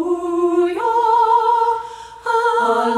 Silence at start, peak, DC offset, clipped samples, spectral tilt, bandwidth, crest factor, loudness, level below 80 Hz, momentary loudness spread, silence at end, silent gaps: 0 s; -4 dBFS; under 0.1%; under 0.1%; -4 dB/octave; 12 kHz; 12 dB; -16 LUFS; -58 dBFS; 9 LU; 0 s; none